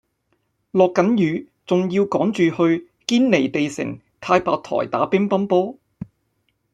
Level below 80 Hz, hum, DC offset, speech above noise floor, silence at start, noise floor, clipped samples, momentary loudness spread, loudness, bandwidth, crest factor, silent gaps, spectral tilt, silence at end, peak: -60 dBFS; none; under 0.1%; 51 dB; 0.75 s; -69 dBFS; under 0.1%; 13 LU; -20 LUFS; 10 kHz; 18 dB; none; -6.5 dB/octave; 0.7 s; -2 dBFS